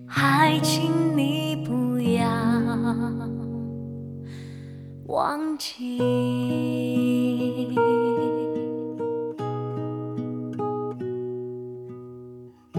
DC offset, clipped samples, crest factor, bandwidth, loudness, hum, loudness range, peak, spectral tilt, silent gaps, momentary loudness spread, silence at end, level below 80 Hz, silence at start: under 0.1%; under 0.1%; 20 dB; 17 kHz; -25 LUFS; none; 7 LU; -6 dBFS; -6 dB/octave; none; 16 LU; 0 s; -64 dBFS; 0 s